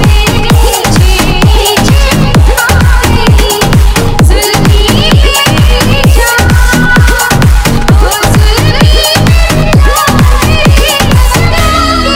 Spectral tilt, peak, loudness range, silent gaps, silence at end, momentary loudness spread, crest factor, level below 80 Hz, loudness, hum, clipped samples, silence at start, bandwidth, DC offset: -4.5 dB/octave; 0 dBFS; 1 LU; none; 0 s; 2 LU; 4 dB; -8 dBFS; -6 LUFS; none; 10%; 0 s; 17 kHz; under 0.1%